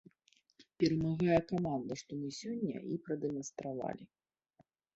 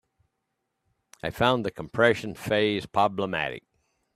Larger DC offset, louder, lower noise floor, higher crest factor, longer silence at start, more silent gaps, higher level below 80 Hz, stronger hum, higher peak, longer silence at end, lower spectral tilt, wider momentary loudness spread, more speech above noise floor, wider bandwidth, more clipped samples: neither; second, -36 LUFS vs -26 LUFS; second, -73 dBFS vs -80 dBFS; about the same, 22 dB vs 22 dB; second, 0.6 s vs 1.25 s; neither; second, -66 dBFS vs -58 dBFS; neither; second, -16 dBFS vs -6 dBFS; first, 0.9 s vs 0.55 s; about the same, -6.5 dB/octave vs -5.5 dB/octave; about the same, 11 LU vs 11 LU; second, 37 dB vs 54 dB; second, 8 kHz vs 14.5 kHz; neither